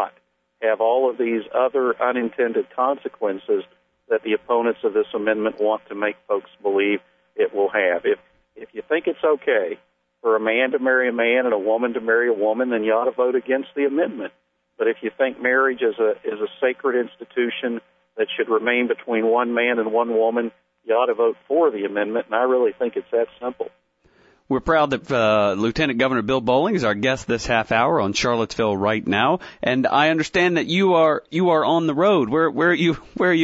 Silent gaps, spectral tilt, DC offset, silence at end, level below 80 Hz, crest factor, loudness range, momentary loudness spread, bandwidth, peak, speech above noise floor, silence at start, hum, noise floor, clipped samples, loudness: none; -5.5 dB/octave; under 0.1%; 0 s; -54 dBFS; 16 dB; 4 LU; 8 LU; 8 kHz; -4 dBFS; 41 dB; 0 s; none; -61 dBFS; under 0.1%; -21 LUFS